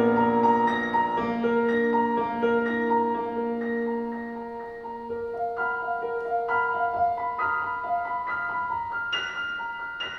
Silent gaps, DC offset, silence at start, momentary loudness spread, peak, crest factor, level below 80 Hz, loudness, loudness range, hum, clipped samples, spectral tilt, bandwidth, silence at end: none; under 0.1%; 0 s; 10 LU; -10 dBFS; 16 dB; -60 dBFS; -26 LUFS; 5 LU; none; under 0.1%; -6 dB/octave; 6.4 kHz; 0 s